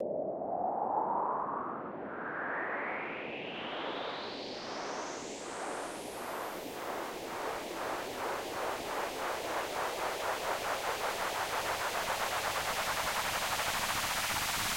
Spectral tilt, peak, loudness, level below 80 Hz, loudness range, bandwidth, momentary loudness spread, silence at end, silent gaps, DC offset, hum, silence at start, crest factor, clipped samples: -2 dB/octave; -20 dBFS; -35 LUFS; -60 dBFS; 7 LU; 16.5 kHz; 8 LU; 0 s; none; under 0.1%; none; 0 s; 16 dB; under 0.1%